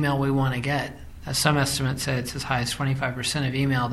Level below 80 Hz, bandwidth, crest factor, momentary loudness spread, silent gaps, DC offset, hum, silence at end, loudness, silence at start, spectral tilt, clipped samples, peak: -44 dBFS; 15 kHz; 20 dB; 6 LU; none; under 0.1%; none; 0 s; -25 LUFS; 0 s; -4.5 dB/octave; under 0.1%; -4 dBFS